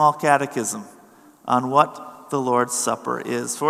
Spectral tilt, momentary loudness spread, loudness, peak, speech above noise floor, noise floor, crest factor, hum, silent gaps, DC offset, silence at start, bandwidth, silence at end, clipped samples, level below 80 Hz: -4 dB/octave; 10 LU; -21 LUFS; 0 dBFS; 29 dB; -50 dBFS; 22 dB; none; none; under 0.1%; 0 s; 15 kHz; 0 s; under 0.1%; -78 dBFS